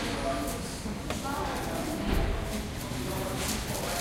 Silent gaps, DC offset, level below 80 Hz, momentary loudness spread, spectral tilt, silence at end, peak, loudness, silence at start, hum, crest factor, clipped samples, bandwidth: none; under 0.1%; -38 dBFS; 4 LU; -4.5 dB/octave; 0 s; -16 dBFS; -33 LUFS; 0 s; none; 16 dB; under 0.1%; 16 kHz